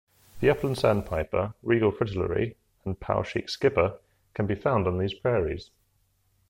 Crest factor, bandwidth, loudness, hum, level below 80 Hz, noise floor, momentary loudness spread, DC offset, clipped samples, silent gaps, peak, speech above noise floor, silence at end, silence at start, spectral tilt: 18 dB; 16.5 kHz; -27 LUFS; none; -48 dBFS; -69 dBFS; 9 LU; under 0.1%; under 0.1%; none; -8 dBFS; 43 dB; 0.85 s; 0.35 s; -7 dB/octave